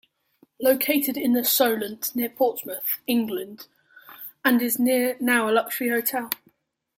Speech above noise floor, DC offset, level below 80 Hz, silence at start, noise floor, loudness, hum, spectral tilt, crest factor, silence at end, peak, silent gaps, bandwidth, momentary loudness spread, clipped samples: 42 dB; under 0.1%; -72 dBFS; 0.6 s; -65 dBFS; -23 LUFS; none; -2.5 dB/octave; 20 dB; 0.6 s; -4 dBFS; none; 16.5 kHz; 11 LU; under 0.1%